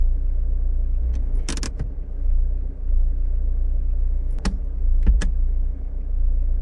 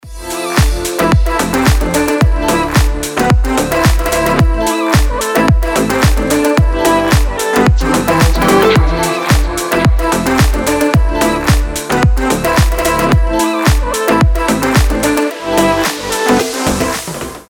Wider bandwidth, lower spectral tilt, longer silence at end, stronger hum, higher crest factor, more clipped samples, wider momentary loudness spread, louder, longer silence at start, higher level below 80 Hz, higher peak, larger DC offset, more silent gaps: second, 10.5 kHz vs over 20 kHz; about the same, -5.5 dB/octave vs -5 dB/octave; about the same, 0 s vs 0.05 s; neither; about the same, 14 dB vs 12 dB; neither; first, 7 LU vs 3 LU; second, -27 LUFS vs -12 LUFS; about the same, 0 s vs 0.05 s; about the same, -20 dBFS vs -16 dBFS; second, -6 dBFS vs 0 dBFS; neither; neither